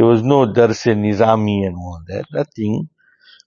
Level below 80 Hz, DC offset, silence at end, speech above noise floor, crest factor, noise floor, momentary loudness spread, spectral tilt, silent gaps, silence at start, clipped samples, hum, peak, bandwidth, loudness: -50 dBFS; under 0.1%; 0.6 s; 33 dB; 16 dB; -50 dBFS; 15 LU; -7.5 dB/octave; none; 0 s; under 0.1%; none; 0 dBFS; 7.4 kHz; -16 LUFS